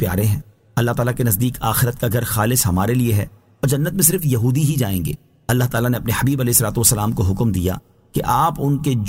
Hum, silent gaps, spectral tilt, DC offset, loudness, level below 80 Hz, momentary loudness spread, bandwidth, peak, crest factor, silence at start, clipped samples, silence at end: none; none; -5 dB/octave; under 0.1%; -18 LUFS; -38 dBFS; 9 LU; 16.5 kHz; 0 dBFS; 18 dB; 0 s; under 0.1%; 0 s